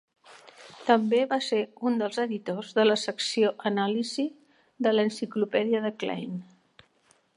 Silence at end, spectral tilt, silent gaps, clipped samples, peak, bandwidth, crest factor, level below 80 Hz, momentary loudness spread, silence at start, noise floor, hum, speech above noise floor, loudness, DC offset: 0.95 s; -4.5 dB/octave; none; under 0.1%; -6 dBFS; 11 kHz; 22 dB; -80 dBFS; 9 LU; 0.3 s; -66 dBFS; none; 39 dB; -27 LUFS; under 0.1%